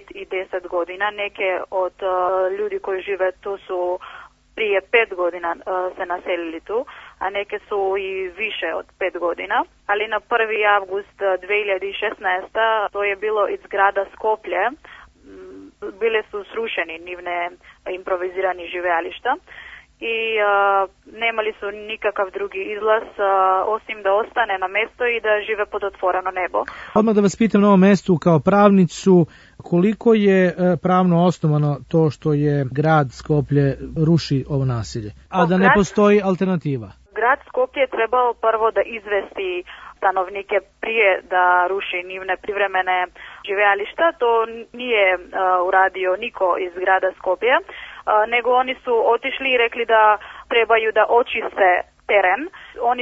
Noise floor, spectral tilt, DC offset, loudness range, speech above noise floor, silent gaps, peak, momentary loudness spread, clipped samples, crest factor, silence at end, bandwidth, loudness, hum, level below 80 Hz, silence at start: -42 dBFS; -6.5 dB/octave; under 0.1%; 8 LU; 23 dB; none; 0 dBFS; 11 LU; under 0.1%; 18 dB; 0 s; 8 kHz; -19 LUFS; none; -52 dBFS; 0.15 s